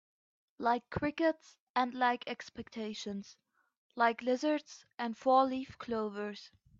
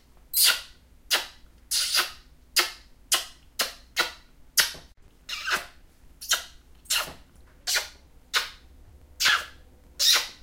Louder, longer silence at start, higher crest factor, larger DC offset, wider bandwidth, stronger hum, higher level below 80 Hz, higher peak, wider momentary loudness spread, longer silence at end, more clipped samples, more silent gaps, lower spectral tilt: second, -34 LUFS vs -25 LUFS; first, 0.6 s vs 0.3 s; second, 20 dB vs 26 dB; neither; second, 7.8 kHz vs 16.5 kHz; neither; second, -68 dBFS vs -54 dBFS; second, -16 dBFS vs -4 dBFS; about the same, 15 LU vs 17 LU; first, 0.3 s vs 0.05 s; neither; first, 1.60-1.74 s, 3.77-3.90 s, 4.94-4.98 s vs none; first, -5 dB/octave vs 2 dB/octave